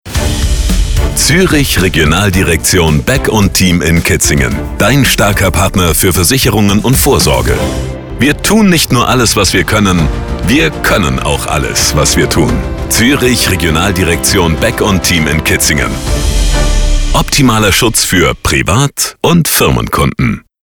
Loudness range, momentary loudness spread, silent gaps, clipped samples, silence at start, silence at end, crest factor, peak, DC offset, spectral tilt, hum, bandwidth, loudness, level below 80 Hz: 1 LU; 6 LU; none; under 0.1%; 0.05 s; 0.25 s; 10 dB; 0 dBFS; under 0.1%; -4 dB/octave; none; over 20 kHz; -9 LUFS; -18 dBFS